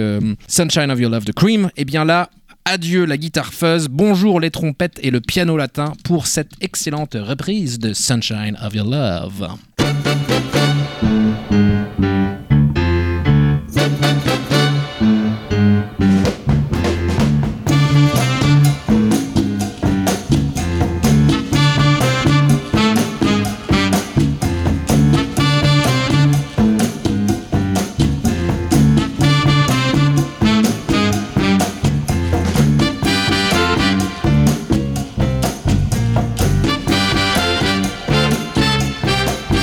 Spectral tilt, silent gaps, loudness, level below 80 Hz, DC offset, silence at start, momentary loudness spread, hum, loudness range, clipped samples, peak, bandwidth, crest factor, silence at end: -5.5 dB/octave; none; -16 LUFS; -30 dBFS; under 0.1%; 0 s; 6 LU; none; 3 LU; under 0.1%; -2 dBFS; 17 kHz; 14 dB; 0 s